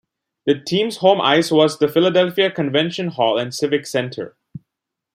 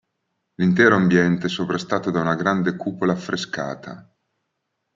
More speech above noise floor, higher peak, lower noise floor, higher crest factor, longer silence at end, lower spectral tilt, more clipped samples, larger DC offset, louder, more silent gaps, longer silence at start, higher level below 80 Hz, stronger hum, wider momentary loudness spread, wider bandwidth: first, 65 dB vs 56 dB; about the same, -2 dBFS vs -2 dBFS; first, -82 dBFS vs -77 dBFS; about the same, 16 dB vs 20 dB; second, 0.55 s vs 0.95 s; second, -5 dB/octave vs -6.5 dB/octave; neither; neither; about the same, -18 LUFS vs -20 LUFS; neither; second, 0.45 s vs 0.6 s; about the same, -64 dBFS vs -62 dBFS; neither; second, 9 LU vs 13 LU; first, 16 kHz vs 7.6 kHz